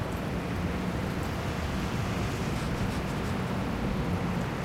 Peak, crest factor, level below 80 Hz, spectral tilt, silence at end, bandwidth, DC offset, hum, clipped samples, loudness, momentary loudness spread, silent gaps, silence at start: -18 dBFS; 12 dB; -40 dBFS; -6 dB/octave; 0 s; 16 kHz; under 0.1%; none; under 0.1%; -31 LUFS; 2 LU; none; 0 s